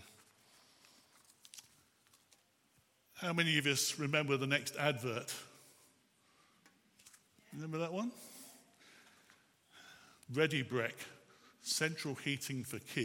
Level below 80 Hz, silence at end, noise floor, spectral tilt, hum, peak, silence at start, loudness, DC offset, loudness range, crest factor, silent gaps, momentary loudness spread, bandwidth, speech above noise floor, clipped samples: -86 dBFS; 0 s; -73 dBFS; -3.5 dB/octave; none; -16 dBFS; 0 s; -37 LUFS; under 0.1%; 12 LU; 26 dB; none; 23 LU; 17.5 kHz; 36 dB; under 0.1%